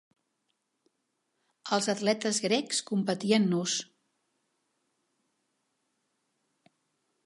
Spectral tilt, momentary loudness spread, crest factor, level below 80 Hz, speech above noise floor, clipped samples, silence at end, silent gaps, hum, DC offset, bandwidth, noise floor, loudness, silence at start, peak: -4 dB/octave; 7 LU; 22 dB; -82 dBFS; 52 dB; under 0.1%; 3.4 s; none; none; under 0.1%; 11.5 kHz; -80 dBFS; -28 LUFS; 1.65 s; -12 dBFS